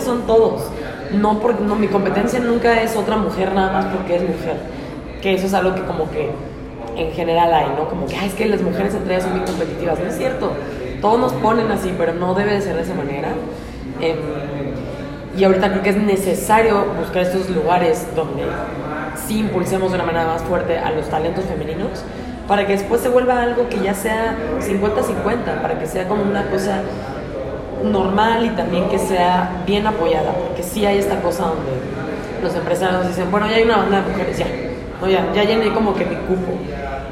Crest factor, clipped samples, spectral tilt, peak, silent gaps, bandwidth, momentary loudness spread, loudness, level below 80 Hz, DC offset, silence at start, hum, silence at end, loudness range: 16 dB; under 0.1%; -6 dB/octave; -2 dBFS; none; 16 kHz; 10 LU; -19 LUFS; -38 dBFS; under 0.1%; 0 s; none; 0 s; 3 LU